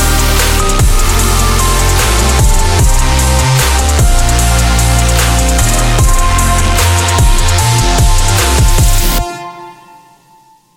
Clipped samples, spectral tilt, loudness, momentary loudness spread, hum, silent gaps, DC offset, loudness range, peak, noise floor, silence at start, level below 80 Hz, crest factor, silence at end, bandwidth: under 0.1%; -3.5 dB/octave; -10 LUFS; 1 LU; none; none; 0.6%; 1 LU; 0 dBFS; -45 dBFS; 0 s; -12 dBFS; 8 dB; 1.05 s; 17 kHz